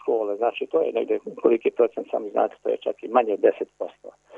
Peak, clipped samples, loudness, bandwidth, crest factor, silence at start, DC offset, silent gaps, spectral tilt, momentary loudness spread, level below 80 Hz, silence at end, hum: -4 dBFS; under 0.1%; -24 LUFS; 3.7 kHz; 20 dB; 0.05 s; under 0.1%; none; -6.5 dB/octave; 9 LU; -76 dBFS; 0 s; none